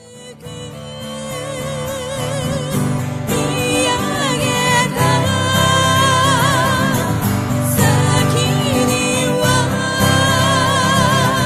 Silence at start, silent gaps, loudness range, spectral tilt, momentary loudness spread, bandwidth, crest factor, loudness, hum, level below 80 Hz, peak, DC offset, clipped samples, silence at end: 0.05 s; none; 6 LU; -4 dB/octave; 12 LU; 15 kHz; 16 dB; -15 LUFS; none; -40 dBFS; 0 dBFS; under 0.1%; under 0.1%; 0 s